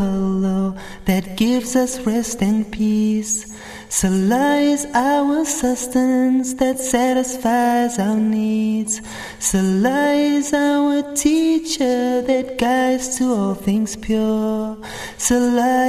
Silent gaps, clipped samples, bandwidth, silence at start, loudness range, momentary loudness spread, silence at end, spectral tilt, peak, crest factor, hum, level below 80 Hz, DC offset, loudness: none; under 0.1%; 14 kHz; 0 s; 2 LU; 6 LU; 0 s; -4.5 dB/octave; -4 dBFS; 14 dB; none; -44 dBFS; under 0.1%; -18 LUFS